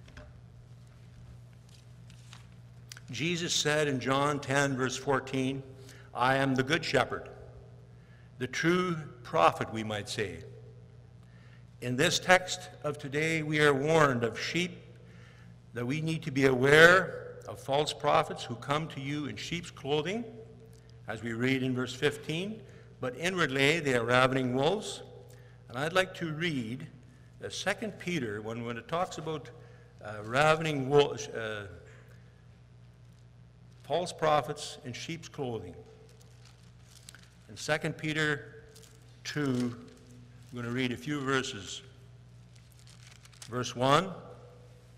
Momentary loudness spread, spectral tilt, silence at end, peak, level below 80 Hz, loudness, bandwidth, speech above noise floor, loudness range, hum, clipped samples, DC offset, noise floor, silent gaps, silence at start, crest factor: 21 LU; -4.5 dB/octave; 0.3 s; -4 dBFS; -62 dBFS; -30 LUFS; 16 kHz; 25 dB; 10 LU; none; under 0.1%; under 0.1%; -55 dBFS; none; 0 s; 26 dB